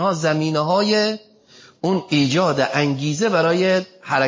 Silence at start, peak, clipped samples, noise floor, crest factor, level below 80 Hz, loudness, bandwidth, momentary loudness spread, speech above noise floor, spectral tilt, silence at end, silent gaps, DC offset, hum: 0 s; -4 dBFS; under 0.1%; -49 dBFS; 16 dB; -64 dBFS; -19 LUFS; 7.6 kHz; 6 LU; 30 dB; -5 dB/octave; 0 s; none; under 0.1%; none